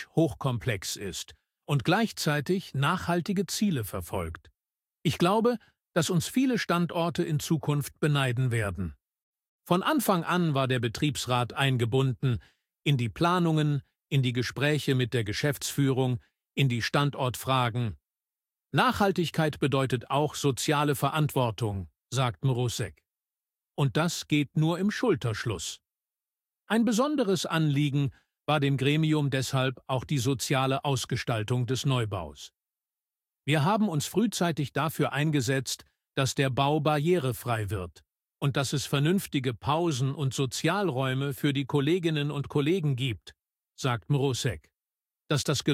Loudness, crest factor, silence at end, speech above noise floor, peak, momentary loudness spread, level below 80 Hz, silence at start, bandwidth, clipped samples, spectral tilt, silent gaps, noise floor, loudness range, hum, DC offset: -28 LUFS; 20 dB; 0 s; over 63 dB; -8 dBFS; 8 LU; -58 dBFS; 0 s; 16.5 kHz; under 0.1%; -5.5 dB/octave; 9.22-9.33 s, 9.48-9.59 s; under -90 dBFS; 2 LU; none; under 0.1%